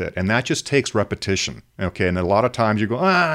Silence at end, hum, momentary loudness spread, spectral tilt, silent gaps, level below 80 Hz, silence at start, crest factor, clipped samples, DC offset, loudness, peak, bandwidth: 0 s; none; 5 LU; -5 dB/octave; none; -50 dBFS; 0 s; 16 dB; under 0.1%; under 0.1%; -20 LUFS; -4 dBFS; 14.5 kHz